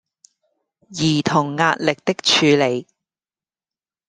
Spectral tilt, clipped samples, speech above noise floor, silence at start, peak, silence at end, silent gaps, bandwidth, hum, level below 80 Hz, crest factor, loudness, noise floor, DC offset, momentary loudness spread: -4 dB/octave; under 0.1%; over 72 dB; 0.9 s; -2 dBFS; 1.25 s; none; 10 kHz; none; -60 dBFS; 20 dB; -18 LUFS; under -90 dBFS; under 0.1%; 8 LU